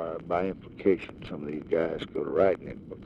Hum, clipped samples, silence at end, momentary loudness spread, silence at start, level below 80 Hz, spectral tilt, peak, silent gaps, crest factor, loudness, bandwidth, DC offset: none; under 0.1%; 0 s; 12 LU; 0 s; -56 dBFS; -8 dB/octave; -10 dBFS; none; 20 dB; -29 LUFS; 7.8 kHz; under 0.1%